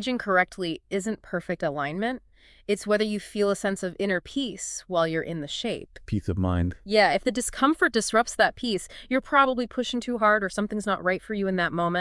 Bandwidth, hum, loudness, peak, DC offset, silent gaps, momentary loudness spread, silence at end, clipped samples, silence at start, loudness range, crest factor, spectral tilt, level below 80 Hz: 12 kHz; none; -26 LUFS; -6 dBFS; under 0.1%; none; 9 LU; 0 s; under 0.1%; 0 s; 5 LU; 20 dB; -4.5 dB/octave; -52 dBFS